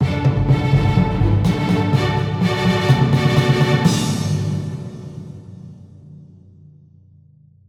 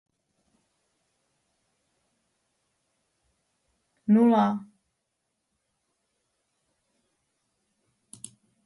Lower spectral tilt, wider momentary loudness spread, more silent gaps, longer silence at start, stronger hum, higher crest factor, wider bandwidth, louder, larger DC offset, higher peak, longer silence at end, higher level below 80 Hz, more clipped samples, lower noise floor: about the same, -6.5 dB/octave vs -7.5 dB/octave; second, 18 LU vs 25 LU; neither; second, 0 s vs 4.1 s; neither; second, 16 dB vs 22 dB; first, 14 kHz vs 11.5 kHz; first, -17 LUFS vs -22 LUFS; neither; first, -2 dBFS vs -10 dBFS; second, 1.55 s vs 4.05 s; first, -34 dBFS vs -78 dBFS; neither; second, -49 dBFS vs -80 dBFS